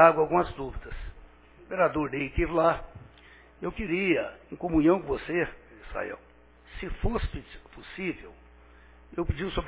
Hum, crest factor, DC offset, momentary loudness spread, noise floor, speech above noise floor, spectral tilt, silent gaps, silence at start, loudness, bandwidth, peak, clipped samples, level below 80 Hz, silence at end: 60 Hz at -60 dBFS; 26 dB; under 0.1%; 20 LU; -54 dBFS; 27 dB; -5 dB/octave; none; 0 s; -29 LUFS; 4 kHz; -4 dBFS; under 0.1%; -42 dBFS; 0 s